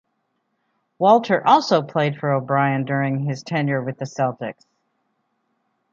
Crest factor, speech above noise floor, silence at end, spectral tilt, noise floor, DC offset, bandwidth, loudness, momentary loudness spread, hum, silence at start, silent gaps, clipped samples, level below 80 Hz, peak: 20 dB; 53 dB; 1.4 s; -6.5 dB/octave; -72 dBFS; under 0.1%; 7.6 kHz; -20 LUFS; 9 LU; none; 1 s; none; under 0.1%; -70 dBFS; -2 dBFS